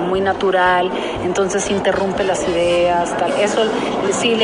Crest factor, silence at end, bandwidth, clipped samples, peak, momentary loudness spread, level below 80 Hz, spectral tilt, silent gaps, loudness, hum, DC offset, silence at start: 14 dB; 0 s; 11 kHz; under 0.1%; -4 dBFS; 4 LU; -44 dBFS; -4 dB/octave; none; -17 LUFS; none; under 0.1%; 0 s